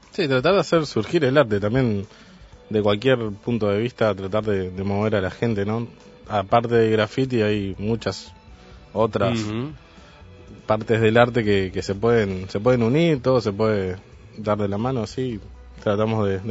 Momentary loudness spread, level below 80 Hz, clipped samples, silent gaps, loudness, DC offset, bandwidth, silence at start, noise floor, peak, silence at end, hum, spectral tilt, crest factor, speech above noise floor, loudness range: 10 LU; -48 dBFS; under 0.1%; none; -22 LUFS; under 0.1%; 8 kHz; 0.15 s; -45 dBFS; 0 dBFS; 0 s; none; -7 dB/octave; 22 dB; 24 dB; 4 LU